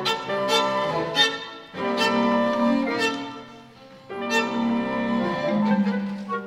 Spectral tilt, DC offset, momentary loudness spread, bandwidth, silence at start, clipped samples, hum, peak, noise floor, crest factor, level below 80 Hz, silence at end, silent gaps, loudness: -4.5 dB/octave; under 0.1%; 12 LU; 16 kHz; 0 s; under 0.1%; none; -6 dBFS; -46 dBFS; 18 dB; -62 dBFS; 0 s; none; -23 LUFS